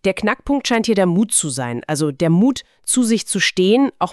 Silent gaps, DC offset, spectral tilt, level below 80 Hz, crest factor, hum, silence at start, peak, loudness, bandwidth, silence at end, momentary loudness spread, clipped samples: none; 0.1%; -4 dB/octave; -48 dBFS; 14 dB; none; 0.05 s; -4 dBFS; -17 LUFS; 13.5 kHz; 0 s; 7 LU; under 0.1%